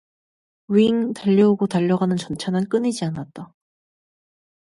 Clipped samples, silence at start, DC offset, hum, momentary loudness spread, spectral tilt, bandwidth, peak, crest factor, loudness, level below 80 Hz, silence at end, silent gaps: under 0.1%; 0.7 s; under 0.1%; none; 12 LU; -7 dB/octave; 11.5 kHz; -6 dBFS; 16 dB; -20 LUFS; -60 dBFS; 1.2 s; none